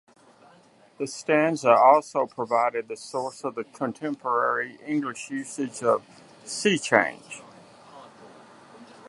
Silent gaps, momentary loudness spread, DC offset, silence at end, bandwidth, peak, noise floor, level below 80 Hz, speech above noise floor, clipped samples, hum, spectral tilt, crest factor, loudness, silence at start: none; 15 LU; under 0.1%; 0.25 s; 11.5 kHz; -2 dBFS; -56 dBFS; -76 dBFS; 32 dB; under 0.1%; none; -4 dB/octave; 24 dB; -25 LUFS; 1 s